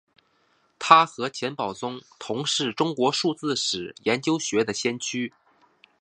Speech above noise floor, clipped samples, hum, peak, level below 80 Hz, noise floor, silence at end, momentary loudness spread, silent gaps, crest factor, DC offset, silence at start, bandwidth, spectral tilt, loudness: 42 dB; under 0.1%; none; 0 dBFS; -70 dBFS; -66 dBFS; 0.7 s; 15 LU; none; 26 dB; under 0.1%; 0.8 s; 11 kHz; -3 dB/octave; -24 LUFS